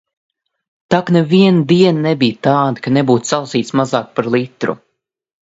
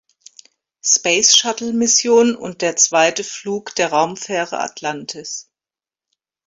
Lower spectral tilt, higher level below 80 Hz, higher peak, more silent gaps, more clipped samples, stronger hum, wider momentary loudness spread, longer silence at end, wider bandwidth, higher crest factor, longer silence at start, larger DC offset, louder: first, -6 dB/octave vs -1 dB/octave; first, -58 dBFS vs -64 dBFS; about the same, 0 dBFS vs 0 dBFS; neither; neither; neither; second, 7 LU vs 14 LU; second, 0.75 s vs 1.05 s; second, 8 kHz vs 16 kHz; about the same, 14 dB vs 18 dB; about the same, 0.9 s vs 0.85 s; neither; about the same, -14 LUFS vs -16 LUFS